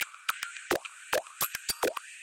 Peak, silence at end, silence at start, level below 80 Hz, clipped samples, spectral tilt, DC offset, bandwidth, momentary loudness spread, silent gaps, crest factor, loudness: -14 dBFS; 0 s; 0 s; -64 dBFS; under 0.1%; -1 dB/octave; under 0.1%; 17 kHz; 3 LU; none; 20 dB; -33 LUFS